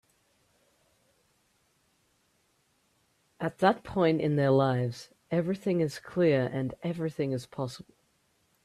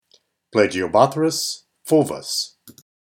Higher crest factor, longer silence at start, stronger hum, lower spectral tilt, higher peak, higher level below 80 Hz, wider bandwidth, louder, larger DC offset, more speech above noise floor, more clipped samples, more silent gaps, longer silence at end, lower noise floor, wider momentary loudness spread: about the same, 20 dB vs 20 dB; first, 3.4 s vs 0.55 s; neither; first, -7.5 dB/octave vs -4 dB/octave; second, -10 dBFS vs 0 dBFS; about the same, -66 dBFS vs -62 dBFS; second, 13.5 kHz vs 17 kHz; second, -29 LUFS vs -20 LUFS; neither; about the same, 43 dB vs 42 dB; neither; neither; first, 0.85 s vs 0.3 s; first, -71 dBFS vs -61 dBFS; first, 12 LU vs 9 LU